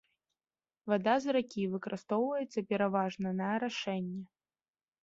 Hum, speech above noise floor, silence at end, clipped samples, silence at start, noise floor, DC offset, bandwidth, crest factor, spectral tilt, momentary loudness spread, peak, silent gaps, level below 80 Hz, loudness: none; over 57 dB; 0.8 s; under 0.1%; 0.85 s; under -90 dBFS; under 0.1%; 7.8 kHz; 20 dB; -5 dB/octave; 9 LU; -16 dBFS; none; -76 dBFS; -34 LUFS